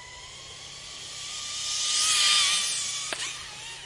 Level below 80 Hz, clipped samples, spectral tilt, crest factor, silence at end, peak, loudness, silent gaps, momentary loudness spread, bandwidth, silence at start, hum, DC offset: -62 dBFS; under 0.1%; 2 dB/octave; 18 dB; 0 s; -10 dBFS; -24 LUFS; none; 21 LU; 11.5 kHz; 0 s; none; under 0.1%